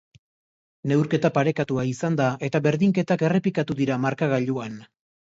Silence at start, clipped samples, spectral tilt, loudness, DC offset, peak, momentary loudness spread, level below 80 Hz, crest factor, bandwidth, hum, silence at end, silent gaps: 0.85 s; under 0.1%; -7.5 dB/octave; -23 LUFS; under 0.1%; -6 dBFS; 7 LU; -62 dBFS; 18 dB; 8 kHz; none; 0.4 s; none